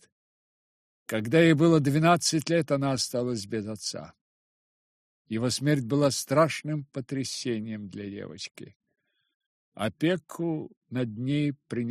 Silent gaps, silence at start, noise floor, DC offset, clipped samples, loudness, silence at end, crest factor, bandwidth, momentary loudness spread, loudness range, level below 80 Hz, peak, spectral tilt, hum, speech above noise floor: 4.21-5.25 s, 8.76-8.80 s, 9.34-9.40 s, 9.46-9.72 s, 10.77-10.81 s; 1.1 s; under -90 dBFS; under 0.1%; under 0.1%; -27 LUFS; 0 s; 20 dB; 14.5 kHz; 16 LU; 10 LU; -66 dBFS; -8 dBFS; -5 dB/octave; none; over 63 dB